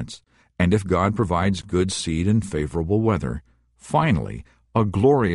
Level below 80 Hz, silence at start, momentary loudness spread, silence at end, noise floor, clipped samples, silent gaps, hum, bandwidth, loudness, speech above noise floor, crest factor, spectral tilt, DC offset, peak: -40 dBFS; 0 s; 13 LU; 0 s; -45 dBFS; under 0.1%; none; none; 11.5 kHz; -22 LUFS; 24 dB; 16 dB; -6.5 dB/octave; under 0.1%; -6 dBFS